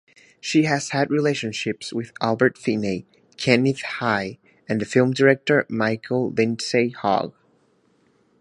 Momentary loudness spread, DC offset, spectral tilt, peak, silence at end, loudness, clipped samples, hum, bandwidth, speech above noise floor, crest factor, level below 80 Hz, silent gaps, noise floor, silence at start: 10 LU; under 0.1%; -5.5 dB/octave; 0 dBFS; 1.1 s; -22 LUFS; under 0.1%; none; 11.5 kHz; 41 dB; 22 dB; -62 dBFS; none; -62 dBFS; 0.45 s